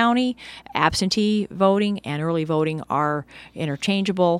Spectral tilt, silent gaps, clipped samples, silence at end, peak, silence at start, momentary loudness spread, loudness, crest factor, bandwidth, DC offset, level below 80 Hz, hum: -5.5 dB/octave; none; under 0.1%; 0 s; 0 dBFS; 0 s; 10 LU; -22 LUFS; 20 dB; 13.5 kHz; under 0.1%; -52 dBFS; none